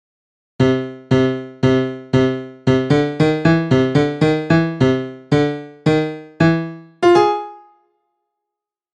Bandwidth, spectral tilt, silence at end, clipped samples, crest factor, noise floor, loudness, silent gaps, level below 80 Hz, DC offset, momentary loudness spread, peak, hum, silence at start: 9.6 kHz; -7.5 dB/octave; 1.4 s; under 0.1%; 16 dB; -84 dBFS; -17 LUFS; none; -46 dBFS; under 0.1%; 8 LU; 0 dBFS; none; 0.6 s